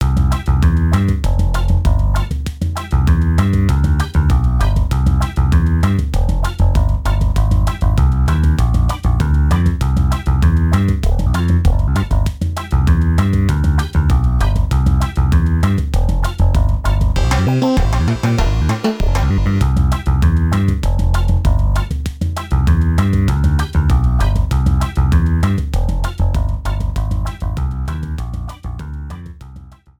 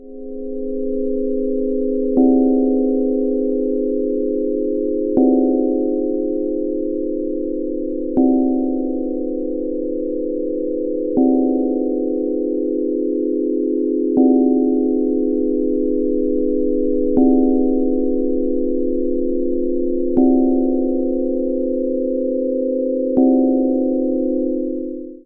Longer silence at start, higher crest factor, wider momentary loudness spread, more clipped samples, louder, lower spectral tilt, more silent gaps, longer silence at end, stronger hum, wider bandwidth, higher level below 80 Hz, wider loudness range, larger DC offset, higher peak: about the same, 0 s vs 0 s; about the same, 12 dB vs 16 dB; about the same, 7 LU vs 8 LU; neither; about the same, -16 LUFS vs -18 LUFS; second, -7 dB/octave vs -15 dB/octave; neither; first, 0.3 s vs 0.05 s; neither; first, 18 kHz vs 1 kHz; first, -16 dBFS vs -40 dBFS; about the same, 2 LU vs 3 LU; neither; about the same, 0 dBFS vs -2 dBFS